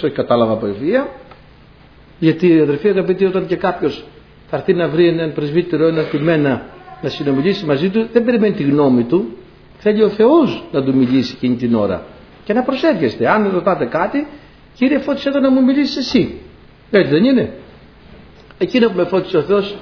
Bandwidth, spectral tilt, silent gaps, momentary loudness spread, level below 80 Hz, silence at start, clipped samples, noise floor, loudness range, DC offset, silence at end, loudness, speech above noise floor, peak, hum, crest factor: 5.4 kHz; -7.5 dB/octave; none; 9 LU; -48 dBFS; 0 s; under 0.1%; -44 dBFS; 2 LU; under 0.1%; 0 s; -16 LUFS; 29 dB; 0 dBFS; none; 16 dB